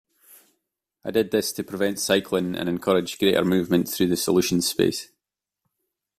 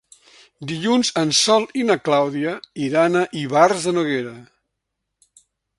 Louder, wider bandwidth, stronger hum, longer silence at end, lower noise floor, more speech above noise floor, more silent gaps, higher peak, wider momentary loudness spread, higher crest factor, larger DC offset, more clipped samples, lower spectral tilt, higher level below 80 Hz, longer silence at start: second, -23 LUFS vs -19 LUFS; first, 16 kHz vs 11.5 kHz; neither; second, 1.15 s vs 1.35 s; first, -86 dBFS vs -79 dBFS; about the same, 63 dB vs 60 dB; neither; second, -6 dBFS vs 0 dBFS; second, 6 LU vs 10 LU; about the same, 18 dB vs 20 dB; neither; neither; about the same, -4.5 dB/octave vs -3.5 dB/octave; first, -58 dBFS vs -64 dBFS; first, 1.05 s vs 0.6 s